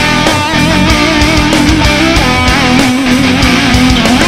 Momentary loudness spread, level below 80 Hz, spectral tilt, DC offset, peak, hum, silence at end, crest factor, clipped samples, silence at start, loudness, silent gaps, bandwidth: 1 LU; -18 dBFS; -4.5 dB/octave; 1%; 0 dBFS; none; 0 s; 8 dB; 0.6%; 0 s; -7 LUFS; none; 16 kHz